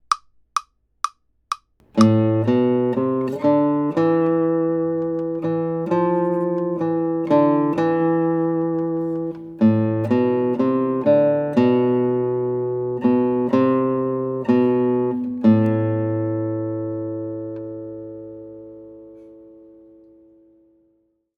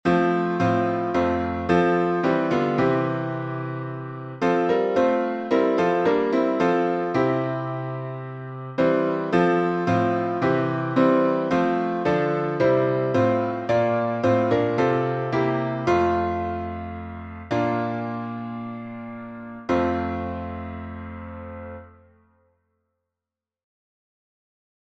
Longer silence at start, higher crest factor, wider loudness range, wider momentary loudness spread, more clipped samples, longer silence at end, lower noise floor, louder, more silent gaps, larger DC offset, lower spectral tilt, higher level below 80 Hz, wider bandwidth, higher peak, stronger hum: about the same, 0.1 s vs 0.05 s; about the same, 20 dB vs 18 dB; about the same, 9 LU vs 8 LU; about the same, 13 LU vs 14 LU; neither; second, 1.95 s vs 3 s; second, -65 dBFS vs -89 dBFS; first, -20 LUFS vs -23 LUFS; neither; neither; about the same, -8.5 dB/octave vs -8 dB/octave; second, -62 dBFS vs -52 dBFS; first, 11 kHz vs 8 kHz; first, -2 dBFS vs -6 dBFS; neither